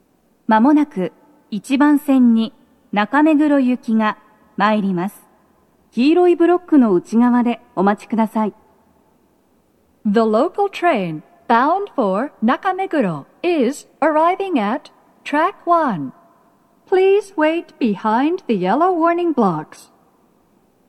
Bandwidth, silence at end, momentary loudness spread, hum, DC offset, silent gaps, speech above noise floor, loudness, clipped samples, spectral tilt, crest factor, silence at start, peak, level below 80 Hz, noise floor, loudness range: 13 kHz; 1.25 s; 12 LU; none; under 0.1%; none; 42 dB; -17 LUFS; under 0.1%; -7 dB/octave; 18 dB; 0.5 s; 0 dBFS; -70 dBFS; -58 dBFS; 4 LU